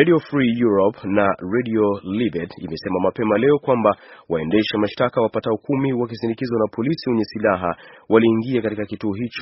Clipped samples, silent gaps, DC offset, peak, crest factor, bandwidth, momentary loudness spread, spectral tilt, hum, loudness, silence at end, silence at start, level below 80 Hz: under 0.1%; none; under 0.1%; 0 dBFS; 20 dB; 6 kHz; 9 LU; -5.5 dB/octave; none; -20 LUFS; 0 s; 0 s; -56 dBFS